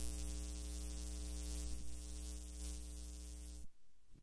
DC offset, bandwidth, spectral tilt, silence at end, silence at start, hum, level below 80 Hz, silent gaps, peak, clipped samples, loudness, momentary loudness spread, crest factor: under 0.1%; 11 kHz; -4 dB/octave; 0 s; 0 s; none; -48 dBFS; none; -28 dBFS; under 0.1%; -49 LUFS; 7 LU; 18 dB